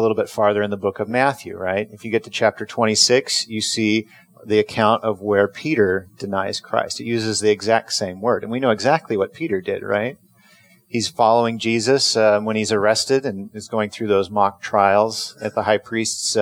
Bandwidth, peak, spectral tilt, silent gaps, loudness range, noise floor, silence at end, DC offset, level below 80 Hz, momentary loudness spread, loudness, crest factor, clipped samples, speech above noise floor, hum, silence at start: 16 kHz; -2 dBFS; -3.5 dB/octave; none; 2 LU; -53 dBFS; 0 s; under 0.1%; -64 dBFS; 8 LU; -19 LUFS; 18 dB; under 0.1%; 33 dB; none; 0 s